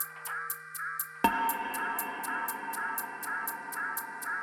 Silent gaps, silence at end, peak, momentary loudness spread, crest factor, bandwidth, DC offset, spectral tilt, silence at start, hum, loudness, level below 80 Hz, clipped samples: none; 0 s; -10 dBFS; 6 LU; 24 dB; 19 kHz; under 0.1%; -2 dB/octave; 0 s; none; -33 LUFS; -66 dBFS; under 0.1%